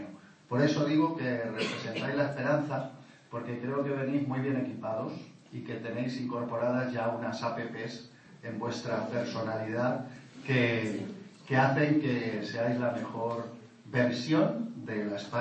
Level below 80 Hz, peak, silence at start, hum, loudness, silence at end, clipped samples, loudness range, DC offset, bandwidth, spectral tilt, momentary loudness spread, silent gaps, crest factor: -76 dBFS; -12 dBFS; 0 s; none; -32 LUFS; 0 s; under 0.1%; 5 LU; under 0.1%; 8.6 kHz; -6.5 dB/octave; 14 LU; none; 18 dB